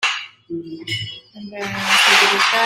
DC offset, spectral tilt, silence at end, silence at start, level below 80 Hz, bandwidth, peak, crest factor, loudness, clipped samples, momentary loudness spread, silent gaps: under 0.1%; -1.5 dB/octave; 0 s; 0 s; -60 dBFS; 16 kHz; 0 dBFS; 18 dB; -15 LUFS; under 0.1%; 20 LU; none